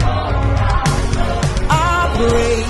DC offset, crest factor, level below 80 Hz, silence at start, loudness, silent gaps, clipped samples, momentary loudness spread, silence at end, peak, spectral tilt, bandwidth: under 0.1%; 14 dB; -20 dBFS; 0 s; -16 LUFS; none; under 0.1%; 4 LU; 0 s; -2 dBFS; -5.5 dB/octave; 12.5 kHz